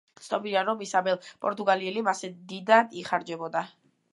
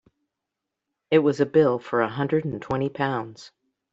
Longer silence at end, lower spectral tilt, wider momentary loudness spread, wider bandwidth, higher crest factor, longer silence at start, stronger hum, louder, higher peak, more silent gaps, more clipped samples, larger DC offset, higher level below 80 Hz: about the same, 0.45 s vs 0.45 s; second, -4 dB/octave vs -7.5 dB/octave; first, 12 LU vs 8 LU; first, 11.5 kHz vs 7.8 kHz; about the same, 22 dB vs 18 dB; second, 0.2 s vs 1.1 s; neither; second, -27 LUFS vs -23 LUFS; about the same, -6 dBFS vs -6 dBFS; neither; neither; neither; second, -80 dBFS vs -62 dBFS